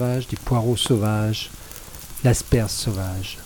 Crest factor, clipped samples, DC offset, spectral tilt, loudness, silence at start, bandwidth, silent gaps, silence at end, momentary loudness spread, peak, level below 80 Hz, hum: 18 dB; under 0.1%; under 0.1%; -5 dB/octave; -22 LUFS; 0 s; 18 kHz; none; 0 s; 16 LU; -4 dBFS; -36 dBFS; none